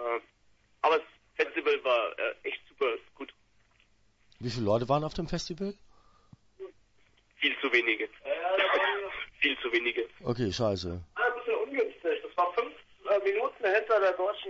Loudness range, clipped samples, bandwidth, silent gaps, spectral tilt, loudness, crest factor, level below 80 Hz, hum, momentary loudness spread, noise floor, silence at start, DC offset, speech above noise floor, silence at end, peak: 6 LU; under 0.1%; 8 kHz; none; -5 dB/octave; -30 LUFS; 20 dB; -58 dBFS; none; 13 LU; -66 dBFS; 0 s; under 0.1%; 36 dB; 0 s; -10 dBFS